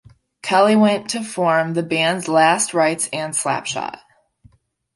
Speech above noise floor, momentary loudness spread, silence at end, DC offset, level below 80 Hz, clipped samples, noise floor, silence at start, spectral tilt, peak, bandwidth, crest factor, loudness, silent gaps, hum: 36 dB; 11 LU; 1 s; under 0.1%; -62 dBFS; under 0.1%; -54 dBFS; 0.45 s; -3.5 dB/octave; -2 dBFS; 11.5 kHz; 18 dB; -18 LUFS; none; none